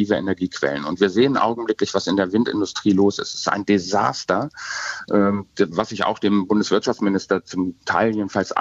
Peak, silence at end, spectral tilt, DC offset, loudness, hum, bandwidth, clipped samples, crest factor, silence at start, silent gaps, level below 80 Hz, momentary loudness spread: -2 dBFS; 0 s; -5 dB/octave; under 0.1%; -21 LUFS; none; 8 kHz; under 0.1%; 18 dB; 0 s; none; -58 dBFS; 6 LU